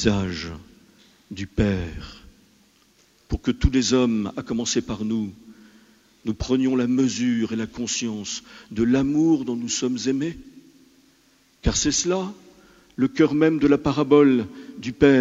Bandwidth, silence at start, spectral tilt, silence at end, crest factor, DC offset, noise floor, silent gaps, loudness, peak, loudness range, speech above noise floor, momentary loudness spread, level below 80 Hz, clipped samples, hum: 8 kHz; 0 s; -5 dB/octave; 0 s; 22 dB; under 0.1%; -59 dBFS; none; -22 LUFS; -2 dBFS; 6 LU; 38 dB; 16 LU; -38 dBFS; under 0.1%; none